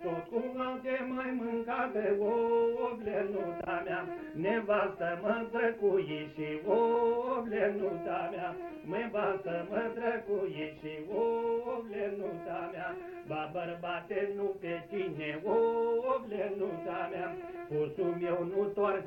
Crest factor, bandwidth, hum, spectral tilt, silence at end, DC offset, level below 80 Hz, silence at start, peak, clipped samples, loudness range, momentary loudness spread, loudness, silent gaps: 16 dB; 17 kHz; none; -8 dB/octave; 0 s; under 0.1%; -68 dBFS; 0 s; -18 dBFS; under 0.1%; 5 LU; 9 LU; -34 LUFS; none